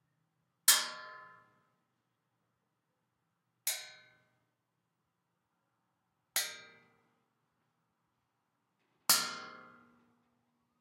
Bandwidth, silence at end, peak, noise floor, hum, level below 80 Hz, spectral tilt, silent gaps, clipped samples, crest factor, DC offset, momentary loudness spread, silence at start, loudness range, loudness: 16 kHz; 1.2 s; -8 dBFS; -84 dBFS; none; under -90 dBFS; 2 dB/octave; none; under 0.1%; 34 dB; under 0.1%; 25 LU; 0.65 s; 11 LU; -31 LUFS